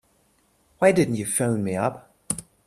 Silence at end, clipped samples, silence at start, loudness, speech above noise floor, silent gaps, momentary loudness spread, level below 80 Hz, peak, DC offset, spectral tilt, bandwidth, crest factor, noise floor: 0.25 s; under 0.1%; 0.8 s; -23 LUFS; 42 dB; none; 11 LU; -60 dBFS; -2 dBFS; under 0.1%; -5 dB/octave; 14.5 kHz; 22 dB; -64 dBFS